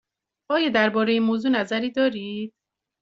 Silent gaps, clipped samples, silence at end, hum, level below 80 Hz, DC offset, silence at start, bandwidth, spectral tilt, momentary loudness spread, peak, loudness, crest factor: none; under 0.1%; 0.55 s; none; -68 dBFS; under 0.1%; 0.5 s; 7.6 kHz; -3 dB/octave; 12 LU; -6 dBFS; -22 LUFS; 18 dB